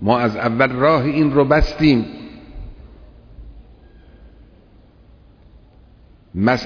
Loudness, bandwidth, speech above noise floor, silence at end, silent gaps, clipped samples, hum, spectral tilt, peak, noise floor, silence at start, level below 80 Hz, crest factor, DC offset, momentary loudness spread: -16 LUFS; 5.4 kHz; 32 dB; 0 s; none; under 0.1%; none; -7.5 dB/octave; -2 dBFS; -48 dBFS; 0 s; -32 dBFS; 18 dB; under 0.1%; 23 LU